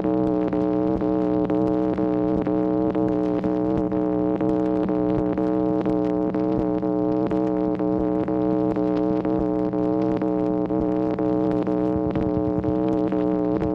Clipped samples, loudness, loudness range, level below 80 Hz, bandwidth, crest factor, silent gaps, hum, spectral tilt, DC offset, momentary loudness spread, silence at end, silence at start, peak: under 0.1%; -23 LUFS; 1 LU; -44 dBFS; 5.2 kHz; 14 dB; none; none; -10.5 dB/octave; under 0.1%; 1 LU; 0 s; 0 s; -8 dBFS